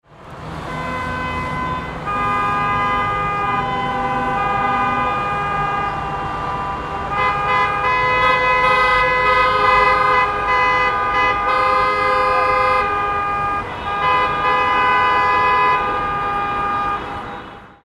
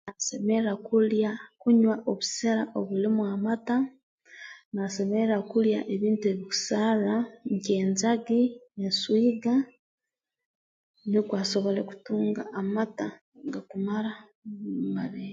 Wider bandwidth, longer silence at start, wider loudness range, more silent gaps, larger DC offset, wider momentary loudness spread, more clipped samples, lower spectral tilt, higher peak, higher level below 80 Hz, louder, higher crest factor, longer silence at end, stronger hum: first, 12.5 kHz vs 7.8 kHz; about the same, 0.1 s vs 0.05 s; about the same, 5 LU vs 5 LU; second, none vs 4.03-4.18 s, 4.65-4.72 s, 9.79-9.98 s, 10.46-10.94 s, 13.21-13.32 s, 14.35-14.42 s; neither; about the same, 10 LU vs 12 LU; neither; about the same, -5 dB/octave vs -5 dB/octave; first, -2 dBFS vs -12 dBFS; first, -38 dBFS vs -74 dBFS; first, -17 LUFS vs -27 LUFS; about the same, 16 dB vs 14 dB; first, 0.15 s vs 0 s; neither